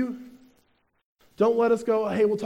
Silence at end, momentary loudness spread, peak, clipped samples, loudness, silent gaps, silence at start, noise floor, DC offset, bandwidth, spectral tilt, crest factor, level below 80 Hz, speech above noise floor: 0 s; 10 LU; -10 dBFS; under 0.1%; -24 LUFS; 1.06-1.16 s; 0 s; -67 dBFS; under 0.1%; 10.5 kHz; -7 dB/octave; 14 dB; -68 dBFS; 45 dB